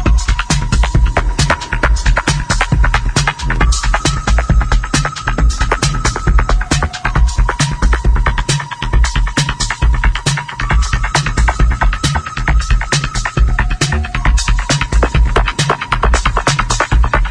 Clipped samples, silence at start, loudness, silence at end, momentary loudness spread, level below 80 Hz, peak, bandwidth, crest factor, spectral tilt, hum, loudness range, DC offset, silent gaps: under 0.1%; 0 s; -15 LUFS; 0 s; 3 LU; -14 dBFS; 0 dBFS; 10.5 kHz; 12 dB; -4 dB/octave; none; 1 LU; under 0.1%; none